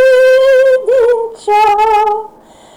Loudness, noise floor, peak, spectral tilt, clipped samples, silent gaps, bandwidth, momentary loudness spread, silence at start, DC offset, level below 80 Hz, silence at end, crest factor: -9 LUFS; -39 dBFS; -4 dBFS; -2 dB/octave; under 0.1%; none; 13 kHz; 8 LU; 0 s; under 0.1%; -46 dBFS; 0.5 s; 6 dB